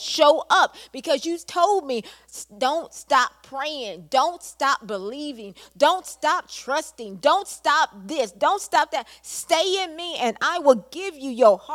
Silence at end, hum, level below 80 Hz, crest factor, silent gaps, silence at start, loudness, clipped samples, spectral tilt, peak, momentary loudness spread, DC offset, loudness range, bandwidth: 0 s; none; -66 dBFS; 20 dB; none; 0 s; -22 LUFS; under 0.1%; -2 dB/octave; -2 dBFS; 14 LU; under 0.1%; 2 LU; 16 kHz